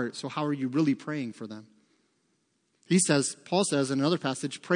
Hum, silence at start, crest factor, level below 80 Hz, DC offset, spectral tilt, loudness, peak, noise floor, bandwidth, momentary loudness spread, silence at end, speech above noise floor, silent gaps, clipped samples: none; 0 s; 20 dB; -80 dBFS; under 0.1%; -4.5 dB/octave; -28 LUFS; -8 dBFS; -73 dBFS; 10.5 kHz; 13 LU; 0 s; 45 dB; none; under 0.1%